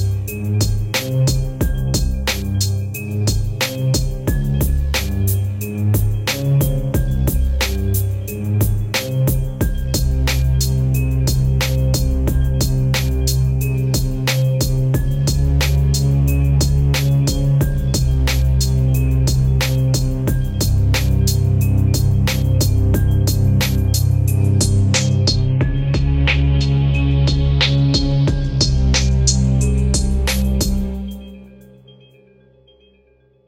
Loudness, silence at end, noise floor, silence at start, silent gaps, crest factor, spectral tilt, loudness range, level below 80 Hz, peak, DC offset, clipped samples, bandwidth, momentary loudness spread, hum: -17 LUFS; 2 s; -55 dBFS; 0 s; none; 16 dB; -5 dB/octave; 4 LU; -22 dBFS; 0 dBFS; under 0.1%; under 0.1%; 17 kHz; 5 LU; none